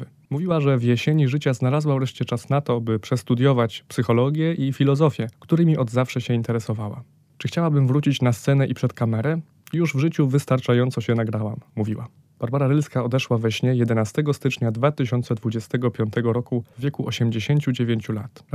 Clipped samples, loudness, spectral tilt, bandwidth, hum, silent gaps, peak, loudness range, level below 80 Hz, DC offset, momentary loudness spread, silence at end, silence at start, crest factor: under 0.1%; -22 LUFS; -7.5 dB/octave; 14 kHz; none; none; -4 dBFS; 2 LU; -64 dBFS; under 0.1%; 9 LU; 0.25 s; 0 s; 16 dB